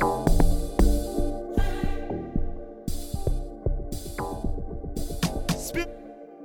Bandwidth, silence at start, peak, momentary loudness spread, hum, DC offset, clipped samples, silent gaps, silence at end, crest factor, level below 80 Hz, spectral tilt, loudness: 17.5 kHz; 0 s; -6 dBFS; 11 LU; none; under 0.1%; under 0.1%; none; 0 s; 18 dB; -28 dBFS; -6 dB/octave; -30 LUFS